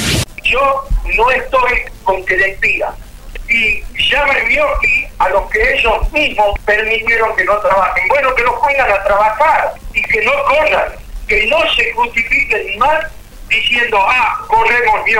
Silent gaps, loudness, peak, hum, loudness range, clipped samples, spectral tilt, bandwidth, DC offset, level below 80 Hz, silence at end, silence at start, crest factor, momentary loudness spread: none; -12 LUFS; -2 dBFS; none; 1 LU; under 0.1%; -3 dB/octave; 19.5 kHz; 0.4%; -28 dBFS; 0 s; 0 s; 12 dB; 5 LU